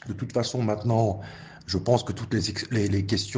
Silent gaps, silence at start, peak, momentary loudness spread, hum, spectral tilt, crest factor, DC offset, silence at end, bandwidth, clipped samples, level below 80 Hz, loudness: none; 0.05 s; -8 dBFS; 7 LU; none; -6 dB/octave; 20 dB; under 0.1%; 0 s; 9.8 kHz; under 0.1%; -56 dBFS; -26 LUFS